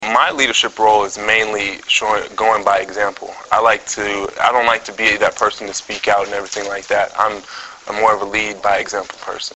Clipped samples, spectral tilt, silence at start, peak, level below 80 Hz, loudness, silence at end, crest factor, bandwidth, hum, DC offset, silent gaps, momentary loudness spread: under 0.1%; -1.5 dB/octave; 0 s; 0 dBFS; -50 dBFS; -16 LUFS; 0 s; 16 dB; 8.2 kHz; none; under 0.1%; none; 10 LU